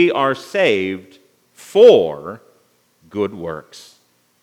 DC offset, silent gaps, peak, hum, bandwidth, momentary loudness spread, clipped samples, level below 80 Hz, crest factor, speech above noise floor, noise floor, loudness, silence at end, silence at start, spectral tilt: under 0.1%; none; 0 dBFS; 60 Hz at -55 dBFS; 13 kHz; 21 LU; under 0.1%; -66 dBFS; 18 dB; 43 dB; -58 dBFS; -15 LUFS; 0.8 s; 0 s; -5.5 dB/octave